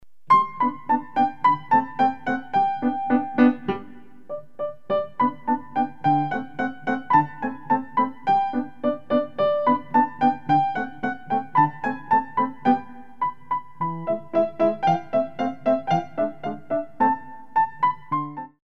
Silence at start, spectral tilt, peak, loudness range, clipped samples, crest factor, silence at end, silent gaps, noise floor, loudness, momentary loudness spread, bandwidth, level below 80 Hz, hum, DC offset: 0 s; -8 dB/octave; -4 dBFS; 3 LU; under 0.1%; 18 dB; 0.1 s; none; -45 dBFS; -23 LUFS; 9 LU; 6.8 kHz; -66 dBFS; none; 0.9%